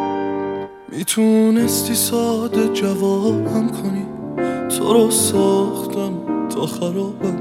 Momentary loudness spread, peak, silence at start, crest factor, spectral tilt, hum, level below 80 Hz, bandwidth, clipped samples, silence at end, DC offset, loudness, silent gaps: 10 LU; -2 dBFS; 0 s; 16 dB; -4.5 dB/octave; none; -58 dBFS; 16.5 kHz; under 0.1%; 0 s; under 0.1%; -18 LUFS; none